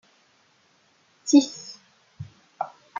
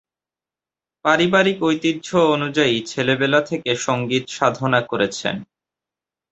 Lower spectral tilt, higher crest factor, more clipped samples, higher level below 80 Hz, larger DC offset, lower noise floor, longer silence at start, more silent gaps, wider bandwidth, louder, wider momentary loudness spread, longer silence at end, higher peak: about the same, -4 dB/octave vs -4.5 dB/octave; first, 24 dB vs 18 dB; neither; second, -74 dBFS vs -60 dBFS; neither; second, -63 dBFS vs -90 dBFS; first, 1.25 s vs 1.05 s; neither; second, 7.4 kHz vs 8.2 kHz; second, -23 LUFS vs -19 LUFS; first, 25 LU vs 6 LU; second, 0.35 s vs 0.85 s; about the same, -4 dBFS vs -2 dBFS